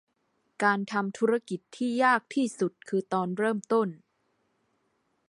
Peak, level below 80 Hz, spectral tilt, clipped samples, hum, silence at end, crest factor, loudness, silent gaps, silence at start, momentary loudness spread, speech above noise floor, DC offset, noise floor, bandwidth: -8 dBFS; -80 dBFS; -5.5 dB/octave; under 0.1%; none; 1.35 s; 20 dB; -28 LUFS; none; 0.6 s; 8 LU; 47 dB; under 0.1%; -74 dBFS; 11.5 kHz